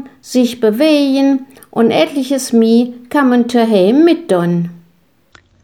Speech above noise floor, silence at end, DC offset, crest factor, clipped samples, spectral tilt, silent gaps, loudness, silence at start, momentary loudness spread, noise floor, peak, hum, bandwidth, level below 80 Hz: 42 dB; 0.85 s; 0.1%; 12 dB; under 0.1%; -5.5 dB/octave; none; -13 LUFS; 0 s; 7 LU; -54 dBFS; -2 dBFS; none; 17 kHz; -62 dBFS